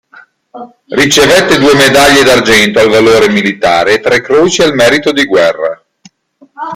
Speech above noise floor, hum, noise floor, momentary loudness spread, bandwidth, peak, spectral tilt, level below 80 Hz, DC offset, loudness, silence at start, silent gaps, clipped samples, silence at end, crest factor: 38 dB; none; -45 dBFS; 7 LU; 17 kHz; 0 dBFS; -3.5 dB/octave; -38 dBFS; under 0.1%; -7 LUFS; 0.55 s; none; 0.2%; 0 s; 8 dB